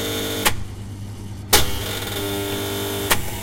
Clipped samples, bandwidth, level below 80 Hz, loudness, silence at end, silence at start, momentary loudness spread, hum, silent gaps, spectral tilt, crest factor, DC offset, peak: under 0.1%; 16.5 kHz; -36 dBFS; -21 LUFS; 0 s; 0 s; 16 LU; none; none; -2.5 dB/octave; 22 dB; under 0.1%; 0 dBFS